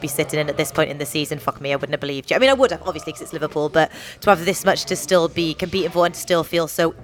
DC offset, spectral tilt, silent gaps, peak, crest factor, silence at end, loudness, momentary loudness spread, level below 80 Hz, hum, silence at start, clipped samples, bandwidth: under 0.1%; -4 dB/octave; none; 0 dBFS; 20 dB; 0 s; -20 LUFS; 8 LU; -50 dBFS; none; 0 s; under 0.1%; 19 kHz